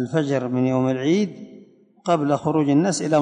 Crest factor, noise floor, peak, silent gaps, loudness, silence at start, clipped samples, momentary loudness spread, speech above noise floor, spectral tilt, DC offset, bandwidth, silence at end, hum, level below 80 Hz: 14 dB; -48 dBFS; -6 dBFS; none; -21 LUFS; 0 s; under 0.1%; 7 LU; 29 dB; -6.5 dB/octave; under 0.1%; 10.5 kHz; 0 s; none; -64 dBFS